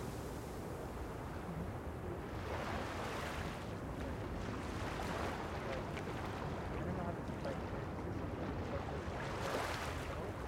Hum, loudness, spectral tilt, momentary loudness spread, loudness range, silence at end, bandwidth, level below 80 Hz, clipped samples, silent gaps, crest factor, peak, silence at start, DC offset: none; -43 LUFS; -6 dB/octave; 5 LU; 2 LU; 0 s; 16 kHz; -52 dBFS; under 0.1%; none; 16 dB; -26 dBFS; 0 s; under 0.1%